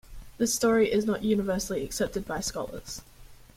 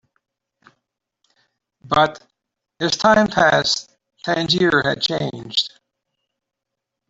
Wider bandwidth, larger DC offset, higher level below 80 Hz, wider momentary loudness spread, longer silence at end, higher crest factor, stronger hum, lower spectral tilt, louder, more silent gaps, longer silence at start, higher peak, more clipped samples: first, 16.5 kHz vs 8 kHz; neither; first, -48 dBFS vs -54 dBFS; first, 14 LU vs 10 LU; second, 0.25 s vs 1.4 s; about the same, 16 dB vs 20 dB; neither; about the same, -4 dB/octave vs -4 dB/octave; second, -28 LUFS vs -18 LUFS; neither; second, 0.1 s vs 1.85 s; second, -12 dBFS vs -2 dBFS; neither